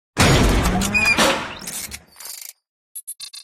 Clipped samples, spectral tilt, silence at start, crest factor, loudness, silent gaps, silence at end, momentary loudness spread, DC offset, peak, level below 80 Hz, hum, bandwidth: under 0.1%; -3.5 dB/octave; 0.15 s; 16 dB; -18 LUFS; 2.69-2.95 s; 0 s; 20 LU; under 0.1%; -4 dBFS; -28 dBFS; none; 17 kHz